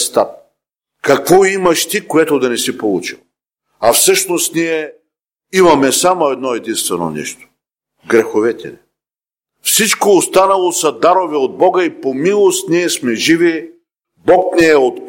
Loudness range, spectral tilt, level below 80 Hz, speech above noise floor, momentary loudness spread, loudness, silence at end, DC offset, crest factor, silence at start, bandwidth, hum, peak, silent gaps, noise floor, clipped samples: 4 LU; -3 dB/octave; -52 dBFS; over 78 dB; 11 LU; -13 LUFS; 0 s; under 0.1%; 14 dB; 0 s; 16.5 kHz; none; 0 dBFS; none; under -90 dBFS; under 0.1%